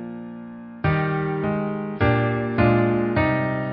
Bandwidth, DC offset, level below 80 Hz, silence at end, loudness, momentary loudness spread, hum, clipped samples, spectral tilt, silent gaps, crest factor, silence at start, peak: 5.4 kHz; under 0.1%; -40 dBFS; 0 s; -22 LUFS; 16 LU; none; under 0.1%; -12.5 dB/octave; none; 16 dB; 0 s; -6 dBFS